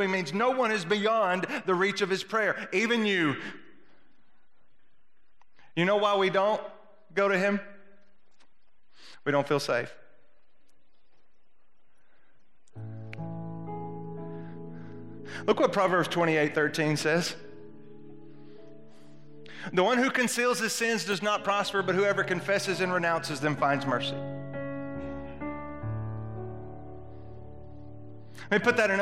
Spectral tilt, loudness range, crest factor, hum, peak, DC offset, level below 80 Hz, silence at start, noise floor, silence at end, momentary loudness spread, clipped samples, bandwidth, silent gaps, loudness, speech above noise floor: -4.5 dB/octave; 13 LU; 22 dB; none; -8 dBFS; 0.5%; -62 dBFS; 0 s; -74 dBFS; 0 s; 19 LU; under 0.1%; 14 kHz; none; -28 LUFS; 47 dB